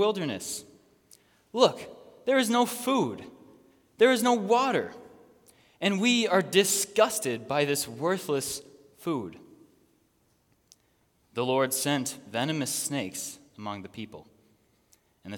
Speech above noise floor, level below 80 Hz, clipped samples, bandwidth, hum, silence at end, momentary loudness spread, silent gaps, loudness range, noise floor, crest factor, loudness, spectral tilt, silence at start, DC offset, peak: 42 dB; -74 dBFS; under 0.1%; 18 kHz; none; 0 s; 16 LU; none; 8 LU; -68 dBFS; 24 dB; -27 LUFS; -3.5 dB/octave; 0 s; under 0.1%; -6 dBFS